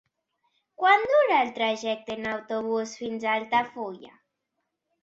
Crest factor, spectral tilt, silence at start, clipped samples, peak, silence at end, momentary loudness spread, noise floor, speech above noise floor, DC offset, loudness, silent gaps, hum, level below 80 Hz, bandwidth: 20 dB; -3.5 dB/octave; 0.8 s; under 0.1%; -8 dBFS; 0.95 s; 13 LU; -81 dBFS; 55 dB; under 0.1%; -25 LUFS; none; none; -70 dBFS; 8 kHz